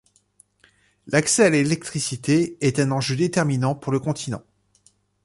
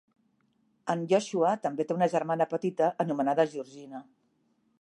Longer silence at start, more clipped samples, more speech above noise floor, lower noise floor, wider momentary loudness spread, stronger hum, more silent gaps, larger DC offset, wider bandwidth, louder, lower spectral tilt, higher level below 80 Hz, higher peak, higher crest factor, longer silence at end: first, 1.05 s vs 0.85 s; neither; second, 40 dB vs 44 dB; second, -61 dBFS vs -72 dBFS; second, 10 LU vs 15 LU; first, 50 Hz at -55 dBFS vs none; neither; neither; about the same, 11.5 kHz vs 11.5 kHz; first, -21 LUFS vs -28 LUFS; about the same, -5 dB/octave vs -6 dB/octave; first, -58 dBFS vs -82 dBFS; first, -4 dBFS vs -12 dBFS; about the same, 20 dB vs 18 dB; about the same, 0.85 s vs 0.8 s